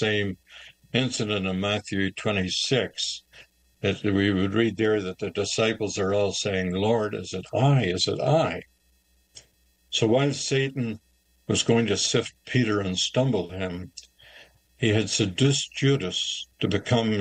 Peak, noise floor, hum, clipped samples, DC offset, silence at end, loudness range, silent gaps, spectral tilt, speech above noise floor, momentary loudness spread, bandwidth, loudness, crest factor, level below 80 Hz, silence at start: -8 dBFS; -64 dBFS; none; under 0.1%; under 0.1%; 0 s; 2 LU; none; -4.5 dB/octave; 40 dB; 9 LU; 10 kHz; -25 LUFS; 18 dB; -60 dBFS; 0 s